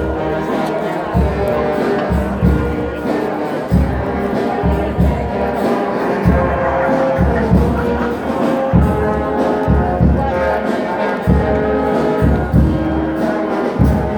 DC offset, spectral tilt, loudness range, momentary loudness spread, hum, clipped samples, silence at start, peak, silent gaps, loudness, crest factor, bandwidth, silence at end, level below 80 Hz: under 0.1%; -8.5 dB/octave; 2 LU; 5 LU; none; under 0.1%; 0 s; 0 dBFS; none; -16 LUFS; 14 dB; 19 kHz; 0 s; -22 dBFS